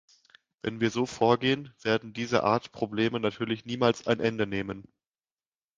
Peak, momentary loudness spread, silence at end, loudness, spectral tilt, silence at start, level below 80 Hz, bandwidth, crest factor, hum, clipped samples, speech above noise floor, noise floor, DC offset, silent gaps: -6 dBFS; 9 LU; 0.95 s; -28 LUFS; -5.5 dB/octave; 0.65 s; -62 dBFS; 9.6 kHz; 22 dB; none; under 0.1%; over 62 dB; under -90 dBFS; under 0.1%; none